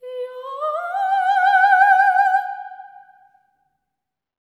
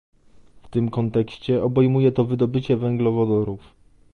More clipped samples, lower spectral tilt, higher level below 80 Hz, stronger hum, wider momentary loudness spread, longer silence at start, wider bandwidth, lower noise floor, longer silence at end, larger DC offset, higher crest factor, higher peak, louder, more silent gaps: neither; second, 2 dB/octave vs -10 dB/octave; second, under -90 dBFS vs -50 dBFS; neither; first, 18 LU vs 7 LU; second, 0.05 s vs 0.55 s; first, 11 kHz vs 6.4 kHz; first, -83 dBFS vs -49 dBFS; first, 1.65 s vs 0.55 s; neither; about the same, 16 dB vs 16 dB; first, -2 dBFS vs -6 dBFS; first, -16 LUFS vs -21 LUFS; neither